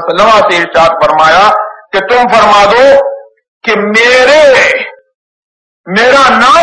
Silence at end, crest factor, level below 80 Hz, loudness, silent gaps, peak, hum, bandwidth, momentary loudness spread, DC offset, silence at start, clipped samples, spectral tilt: 0 s; 6 dB; -40 dBFS; -6 LUFS; 3.48-3.61 s, 5.15-5.84 s; 0 dBFS; none; 11 kHz; 10 LU; under 0.1%; 0 s; 4%; -3 dB/octave